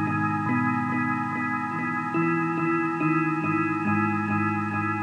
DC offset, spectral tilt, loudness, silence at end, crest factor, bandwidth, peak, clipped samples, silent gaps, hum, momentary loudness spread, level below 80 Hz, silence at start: under 0.1%; -8.5 dB/octave; -25 LUFS; 0 s; 14 dB; 10.5 kHz; -12 dBFS; under 0.1%; none; none; 3 LU; -72 dBFS; 0 s